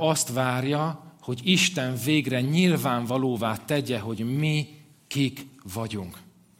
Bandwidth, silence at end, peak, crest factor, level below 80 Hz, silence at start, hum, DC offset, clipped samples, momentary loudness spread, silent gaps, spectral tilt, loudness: 16.5 kHz; 0.35 s; -6 dBFS; 20 dB; -66 dBFS; 0 s; none; under 0.1%; under 0.1%; 13 LU; none; -4.5 dB/octave; -25 LUFS